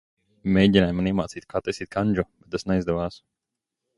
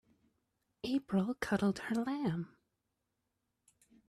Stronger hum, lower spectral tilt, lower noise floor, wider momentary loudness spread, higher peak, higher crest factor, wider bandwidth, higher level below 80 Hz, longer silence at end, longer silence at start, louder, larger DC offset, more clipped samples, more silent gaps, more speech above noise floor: neither; about the same, -7 dB/octave vs -6.5 dB/octave; about the same, -85 dBFS vs -85 dBFS; first, 12 LU vs 9 LU; first, -2 dBFS vs -18 dBFS; about the same, 22 dB vs 22 dB; second, 11 kHz vs 13.5 kHz; first, -46 dBFS vs -68 dBFS; second, 0.8 s vs 1.65 s; second, 0.45 s vs 0.85 s; first, -24 LUFS vs -36 LUFS; neither; neither; neither; first, 62 dB vs 51 dB